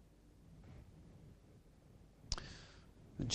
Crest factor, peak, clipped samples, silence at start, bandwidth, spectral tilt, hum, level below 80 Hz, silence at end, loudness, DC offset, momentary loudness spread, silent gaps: 30 dB; -20 dBFS; under 0.1%; 0 s; 14.5 kHz; -3.5 dB/octave; none; -58 dBFS; 0 s; -52 LUFS; under 0.1%; 19 LU; none